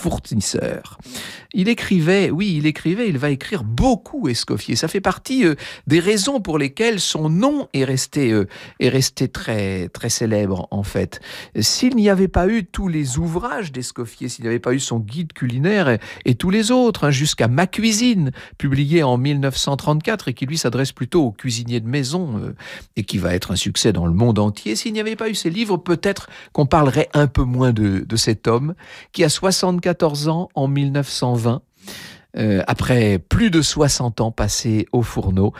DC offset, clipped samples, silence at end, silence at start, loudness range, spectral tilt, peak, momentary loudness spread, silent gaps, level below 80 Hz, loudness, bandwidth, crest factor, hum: under 0.1%; under 0.1%; 0 s; 0 s; 3 LU; -5 dB/octave; -4 dBFS; 10 LU; none; -38 dBFS; -19 LUFS; 16 kHz; 16 dB; none